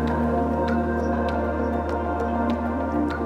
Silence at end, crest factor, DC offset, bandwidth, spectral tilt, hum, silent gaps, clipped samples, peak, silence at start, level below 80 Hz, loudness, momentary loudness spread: 0 s; 12 dB; under 0.1%; 9.2 kHz; -8.5 dB/octave; none; none; under 0.1%; -12 dBFS; 0 s; -36 dBFS; -24 LUFS; 2 LU